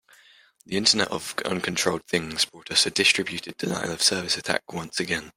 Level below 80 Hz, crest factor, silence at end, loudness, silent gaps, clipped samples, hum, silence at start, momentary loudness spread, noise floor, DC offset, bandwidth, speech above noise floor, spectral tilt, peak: -62 dBFS; 22 dB; 0.05 s; -24 LUFS; none; under 0.1%; none; 0.7 s; 10 LU; -56 dBFS; under 0.1%; 16 kHz; 30 dB; -2 dB/octave; -4 dBFS